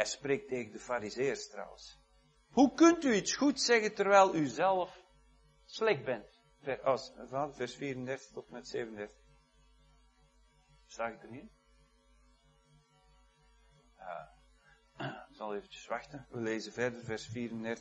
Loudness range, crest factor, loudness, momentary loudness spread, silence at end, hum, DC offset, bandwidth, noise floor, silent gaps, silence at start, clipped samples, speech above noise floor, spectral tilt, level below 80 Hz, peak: 21 LU; 24 dB; -33 LUFS; 21 LU; 0 s; none; under 0.1%; 9 kHz; -68 dBFS; none; 0 s; under 0.1%; 35 dB; -4 dB/octave; -68 dBFS; -12 dBFS